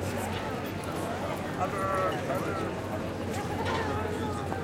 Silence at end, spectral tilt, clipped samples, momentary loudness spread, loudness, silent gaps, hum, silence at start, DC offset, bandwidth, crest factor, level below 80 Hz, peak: 0 s; -5.5 dB/octave; under 0.1%; 5 LU; -32 LUFS; none; none; 0 s; under 0.1%; 17 kHz; 16 dB; -52 dBFS; -16 dBFS